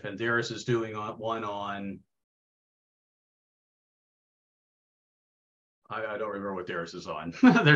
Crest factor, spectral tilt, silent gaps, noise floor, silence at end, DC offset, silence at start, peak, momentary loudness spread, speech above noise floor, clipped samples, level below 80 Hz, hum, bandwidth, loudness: 24 dB; -6 dB/octave; 2.24-5.82 s; under -90 dBFS; 0 s; under 0.1%; 0.05 s; -6 dBFS; 15 LU; over 62 dB; under 0.1%; -70 dBFS; none; 7.8 kHz; -30 LUFS